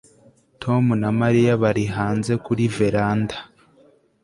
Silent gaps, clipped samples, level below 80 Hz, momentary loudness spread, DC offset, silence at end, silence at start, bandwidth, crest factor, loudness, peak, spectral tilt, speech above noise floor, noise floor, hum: none; under 0.1%; -50 dBFS; 7 LU; under 0.1%; 0.8 s; 0.6 s; 11.5 kHz; 16 dB; -20 LUFS; -6 dBFS; -7.5 dB/octave; 36 dB; -55 dBFS; none